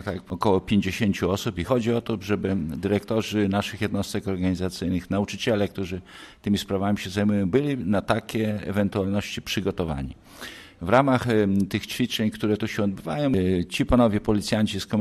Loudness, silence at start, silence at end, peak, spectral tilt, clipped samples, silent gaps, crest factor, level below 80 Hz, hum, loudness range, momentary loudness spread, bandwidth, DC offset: -25 LUFS; 0 s; 0 s; -6 dBFS; -6 dB/octave; under 0.1%; none; 18 dB; -46 dBFS; none; 3 LU; 7 LU; 13.5 kHz; under 0.1%